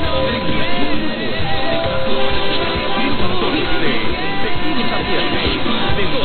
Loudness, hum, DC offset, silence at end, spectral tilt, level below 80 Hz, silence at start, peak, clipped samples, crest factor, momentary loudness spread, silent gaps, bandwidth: -18 LUFS; none; under 0.1%; 0 s; -9 dB/octave; -32 dBFS; 0 s; -2 dBFS; under 0.1%; 12 dB; 3 LU; none; 13.5 kHz